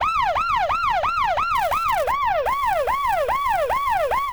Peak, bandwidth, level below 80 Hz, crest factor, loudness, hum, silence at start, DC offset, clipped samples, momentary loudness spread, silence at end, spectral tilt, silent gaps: -10 dBFS; over 20 kHz; -42 dBFS; 12 dB; -21 LUFS; none; 0 s; 0.3%; under 0.1%; 1 LU; 0 s; -3 dB/octave; none